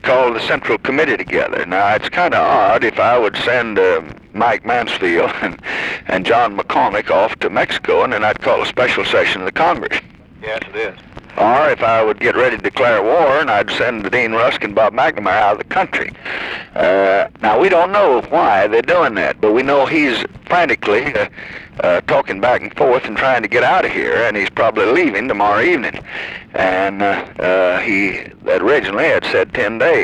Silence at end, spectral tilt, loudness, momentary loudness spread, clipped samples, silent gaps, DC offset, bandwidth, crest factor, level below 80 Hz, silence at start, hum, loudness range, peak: 0 s; -5 dB/octave; -15 LUFS; 8 LU; under 0.1%; none; under 0.1%; 11 kHz; 12 dB; -46 dBFS; 0.05 s; none; 3 LU; -2 dBFS